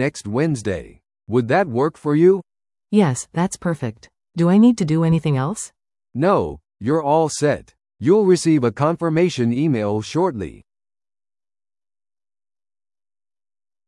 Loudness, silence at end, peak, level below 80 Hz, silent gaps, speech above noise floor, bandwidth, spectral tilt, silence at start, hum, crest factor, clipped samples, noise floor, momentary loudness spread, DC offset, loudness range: -19 LUFS; 3.35 s; -4 dBFS; -54 dBFS; none; over 72 dB; 12 kHz; -6.5 dB/octave; 0 s; none; 16 dB; under 0.1%; under -90 dBFS; 12 LU; under 0.1%; 6 LU